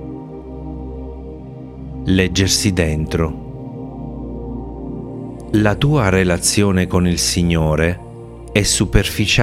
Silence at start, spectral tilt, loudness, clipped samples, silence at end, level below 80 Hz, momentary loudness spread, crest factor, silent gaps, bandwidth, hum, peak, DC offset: 0 s; -4.5 dB/octave; -16 LUFS; under 0.1%; 0 s; -30 dBFS; 17 LU; 18 dB; none; 16 kHz; none; 0 dBFS; under 0.1%